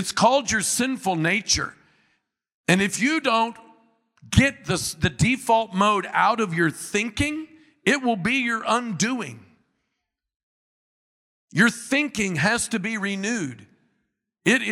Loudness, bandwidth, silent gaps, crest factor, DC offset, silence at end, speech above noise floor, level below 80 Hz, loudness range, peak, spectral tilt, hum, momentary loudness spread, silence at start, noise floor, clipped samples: -22 LUFS; 15.5 kHz; 2.54-2.64 s, 10.36-11.48 s; 22 dB; under 0.1%; 0 s; 58 dB; -50 dBFS; 5 LU; -2 dBFS; -4 dB/octave; none; 7 LU; 0 s; -81 dBFS; under 0.1%